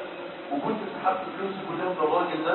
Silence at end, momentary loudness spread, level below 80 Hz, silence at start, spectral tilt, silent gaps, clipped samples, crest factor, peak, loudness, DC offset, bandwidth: 0 s; 8 LU; -72 dBFS; 0 s; -9.5 dB/octave; none; under 0.1%; 18 dB; -10 dBFS; -29 LUFS; under 0.1%; 4.3 kHz